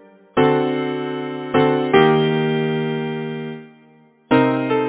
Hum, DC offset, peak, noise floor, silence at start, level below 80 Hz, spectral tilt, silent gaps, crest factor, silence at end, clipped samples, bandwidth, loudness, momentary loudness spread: none; under 0.1%; 0 dBFS; -51 dBFS; 0.35 s; -56 dBFS; -10.5 dB/octave; none; 18 dB; 0 s; under 0.1%; 4 kHz; -19 LUFS; 12 LU